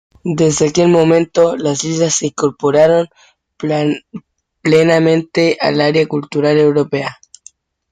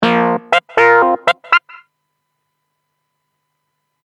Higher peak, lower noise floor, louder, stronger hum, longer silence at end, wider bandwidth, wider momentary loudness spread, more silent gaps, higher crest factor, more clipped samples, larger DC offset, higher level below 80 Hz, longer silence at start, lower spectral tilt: about the same, 0 dBFS vs 0 dBFS; second, -46 dBFS vs -71 dBFS; about the same, -13 LUFS vs -13 LUFS; neither; second, 0.8 s vs 2.5 s; second, 9.6 kHz vs 11.5 kHz; first, 9 LU vs 5 LU; neither; about the same, 14 dB vs 16 dB; neither; neither; first, -54 dBFS vs -62 dBFS; first, 0.25 s vs 0 s; about the same, -5 dB/octave vs -5 dB/octave